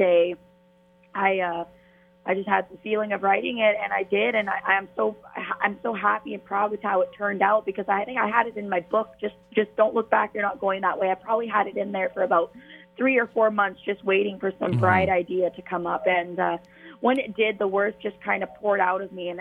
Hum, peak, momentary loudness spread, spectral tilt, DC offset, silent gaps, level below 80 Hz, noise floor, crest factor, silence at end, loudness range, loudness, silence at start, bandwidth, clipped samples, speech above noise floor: none; -4 dBFS; 7 LU; -8 dB/octave; under 0.1%; none; -62 dBFS; -58 dBFS; 20 dB; 0 s; 2 LU; -24 LUFS; 0 s; 4.5 kHz; under 0.1%; 34 dB